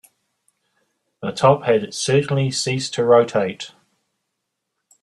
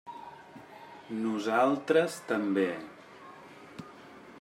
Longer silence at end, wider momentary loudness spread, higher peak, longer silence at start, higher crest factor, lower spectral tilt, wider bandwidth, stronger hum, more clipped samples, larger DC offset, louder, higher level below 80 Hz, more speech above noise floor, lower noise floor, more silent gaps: first, 1.35 s vs 0 s; second, 14 LU vs 23 LU; first, 0 dBFS vs -12 dBFS; first, 1.2 s vs 0.05 s; about the same, 20 dB vs 20 dB; about the same, -5 dB/octave vs -5.5 dB/octave; second, 12 kHz vs 15.5 kHz; neither; neither; neither; first, -18 LUFS vs -29 LUFS; first, -60 dBFS vs -78 dBFS; first, 60 dB vs 22 dB; first, -78 dBFS vs -51 dBFS; neither